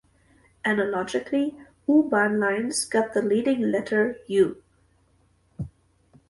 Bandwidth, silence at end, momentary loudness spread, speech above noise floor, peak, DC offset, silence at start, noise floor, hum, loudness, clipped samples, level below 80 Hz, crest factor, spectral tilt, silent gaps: 11.5 kHz; 0.6 s; 10 LU; 40 dB; -8 dBFS; under 0.1%; 0.65 s; -63 dBFS; none; -24 LUFS; under 0.1%; -60 dBFS; 16 dB; -4.5 dB/octave; none